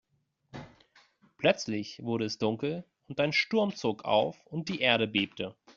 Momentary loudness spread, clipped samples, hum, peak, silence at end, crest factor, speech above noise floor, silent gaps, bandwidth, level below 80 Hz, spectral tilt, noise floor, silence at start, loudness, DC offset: 14 LU; under 0.1%; none; -8 dBFS; 0.05 s; 22 dB; 44 dB; none; 7.6 kHz; -68 dBFS; -3 dB/octave; -73 dBFS; 0.55 s; -30 LUFS; under 0.1%